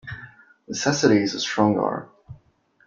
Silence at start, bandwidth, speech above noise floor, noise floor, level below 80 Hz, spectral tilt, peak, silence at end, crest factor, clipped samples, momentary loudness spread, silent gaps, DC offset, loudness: 0.05 s; 7.6 kHz; 39 dB; -60 dBFS; -60 dBFS; -4.5 dB/octave; -2 dBFS; 0.5 s; 22 dB; under 0.1%; 16 LU; none; under 0.1%; -22 LUFS